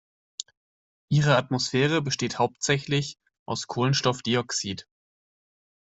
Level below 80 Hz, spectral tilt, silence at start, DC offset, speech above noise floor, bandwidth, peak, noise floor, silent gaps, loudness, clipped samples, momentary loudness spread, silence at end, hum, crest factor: -60 dBFS; -4.5 dB/octave; 1.1 s; under 0.1%; over 65 dB; 8.2 kHz; -6 dBFS; under -90 dBFS; 3.39-3.46 s; -25 LUFS; under 0.1%; 17 LU; 1 s; none; 22 dB